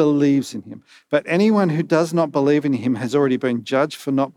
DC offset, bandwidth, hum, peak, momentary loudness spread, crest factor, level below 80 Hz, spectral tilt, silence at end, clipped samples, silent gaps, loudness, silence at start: under 0.1%; 13.5 kHz; none; -2 dBFS; 6 LU; 16 dB; -76 dBFS; -7 dB/octave; 0.05 s; under 0.1%; none; -19 LUFS; 0 s